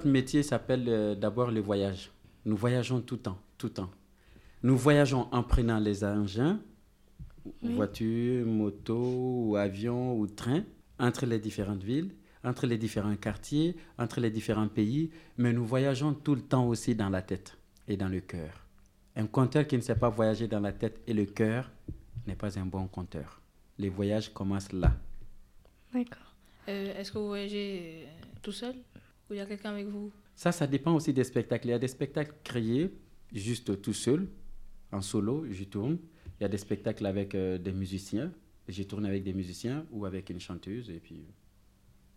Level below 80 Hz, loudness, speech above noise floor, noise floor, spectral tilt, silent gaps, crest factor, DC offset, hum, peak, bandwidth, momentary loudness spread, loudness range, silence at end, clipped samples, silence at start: -46 dBFS; -32 LUFS; 31 dB; -62 dBFS; -7 dB/octave; none; 22 dB; under 0.1%; none; -10 dBFS; 15.5 kHz; 13 LU; 8 LU; 0.85 s; under 0.1%; 0 s